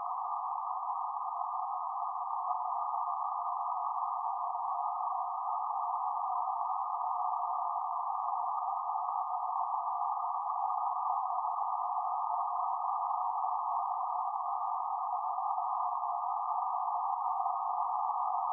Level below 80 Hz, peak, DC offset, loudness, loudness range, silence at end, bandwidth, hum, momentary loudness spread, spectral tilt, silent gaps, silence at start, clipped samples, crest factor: under -90 dBFS; -20 dBFS; under 0.1%; -34 LUFS; 1 LU; 0 s; 1.4 kHz; none; 3 LU; 27.5 dB/octave; none; 0 s; under 0.1%; 14 dB